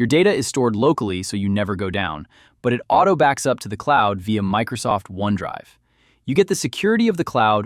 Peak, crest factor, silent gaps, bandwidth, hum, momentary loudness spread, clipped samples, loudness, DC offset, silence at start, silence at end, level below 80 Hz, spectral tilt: -4 dBFS; 16 dB; none; 15 kHz; none; 8 LU; under 0.1%; -20 LUFS; under 0.1%; 0 s; 0 s; -54 dBFS; -5 dB/octave